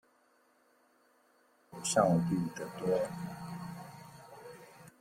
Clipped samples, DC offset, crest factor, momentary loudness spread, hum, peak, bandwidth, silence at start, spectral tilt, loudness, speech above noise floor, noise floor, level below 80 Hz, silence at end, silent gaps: under 0.1%; under 0.1%; 22 dB; 24 LU; none; -14 dBFS; 16 kHz; 1.7 s; -5.5 dB/octave; -34 LUFS; 38 dB; -70 dBFS; -70 dBFS; 0.1 s; none